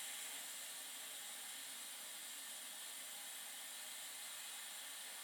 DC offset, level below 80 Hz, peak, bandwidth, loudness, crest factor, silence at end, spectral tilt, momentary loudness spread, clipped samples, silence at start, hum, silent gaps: under 0.1%; under -90 dBFS; -36 dBFS; over 20 kHz; -48 LUFS; 14 dB; 0 s; 2.5 dB/octave; 2 LU; under 0.1%; 0 s; none; none